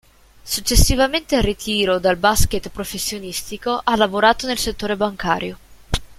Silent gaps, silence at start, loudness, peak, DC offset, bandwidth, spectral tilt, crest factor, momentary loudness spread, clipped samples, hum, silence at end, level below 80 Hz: none; 0.45 s; -19 LUFS; 0 dBFS; under 0.1%; 16.5 kHz; -3.5 dB/octave; 20 dB; 11 LU; under 0.1%; none; 0.05 s; -28 dBFS